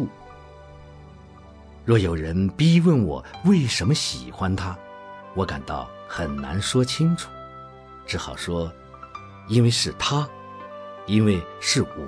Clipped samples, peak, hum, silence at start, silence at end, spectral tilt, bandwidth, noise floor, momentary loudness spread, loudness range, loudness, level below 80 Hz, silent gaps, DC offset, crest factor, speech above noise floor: under 0.1%; -8 dBFS; none; 0 s; 0 s; -5.5 dB/octave; 11 kHz; -45 dBFS; 21 LU; 5 LU; -23 LUFS; -44 dBFS; none; under 0.1%; 16 dB; 23 dB